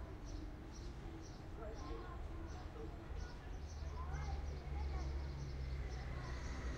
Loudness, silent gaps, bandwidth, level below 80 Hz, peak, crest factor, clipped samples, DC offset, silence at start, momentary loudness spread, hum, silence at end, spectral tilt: -49 LUFS; none; 8.6 kHz; -48 dBFS; -32 dBFS; 14 dB; under 0.1%; under 0.1%; 0 s; 7 LU; none; 0 s; -6 dB/octave